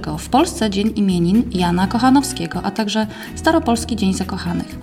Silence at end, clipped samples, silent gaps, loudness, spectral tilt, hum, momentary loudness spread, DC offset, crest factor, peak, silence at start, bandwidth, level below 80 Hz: 0 s; under 0.1%; none; -18 LUFS; -5.5 dB/octave; none; 8 LU; under 0.1%; 16 dB; -2 dBFS; 0 s; 16 kHz; -36 dBFS